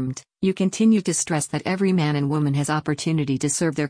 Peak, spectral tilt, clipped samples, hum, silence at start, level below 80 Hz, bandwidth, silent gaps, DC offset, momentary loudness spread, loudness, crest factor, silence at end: -10 dBFS; -5.5 dB/octave; under 0.1%; none; 0 s; -58 dBFS; 10.5 kHz; none; under 0.1%; 6 LU; -22 LUFS; 12 dB; 0 s